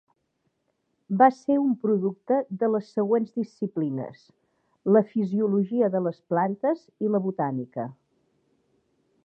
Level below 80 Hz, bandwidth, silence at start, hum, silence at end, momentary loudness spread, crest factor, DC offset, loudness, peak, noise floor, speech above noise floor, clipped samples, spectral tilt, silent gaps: -78 dBFS; 6.6 kHz; 1.1 s; none; 1.3 s; 11 LU; 20 dB; under 0.1%; -25 LUFS; -6 dBFS; -75 dBFS; 50 dB; under 0.1%; -9.5 dB/octave; none